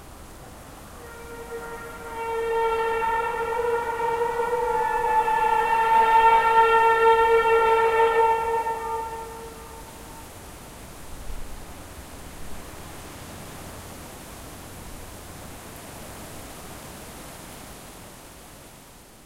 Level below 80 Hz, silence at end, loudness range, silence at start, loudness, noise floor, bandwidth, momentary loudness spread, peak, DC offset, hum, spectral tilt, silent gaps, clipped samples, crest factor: -46 dBFS; 0.35 s; 22 LU; 0 s; -21 LUFS; -48 dBFS; 16 kHz; 24 LU; -6 dBFS; under 0.1%; none; -3.5 dB/octave; none; under 0.1%; 20 dB